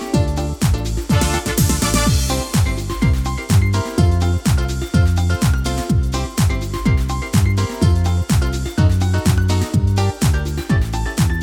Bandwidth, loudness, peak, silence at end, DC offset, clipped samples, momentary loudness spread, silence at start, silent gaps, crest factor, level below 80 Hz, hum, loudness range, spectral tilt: over 20 kHz; -18 LUFS; -2 dBFS; 0 s; under 0.1%; under 0.1%; 4 LU; 0 s; none; 14 dB; -22 dBFS; none; 1 LU; -5.5 dB/octave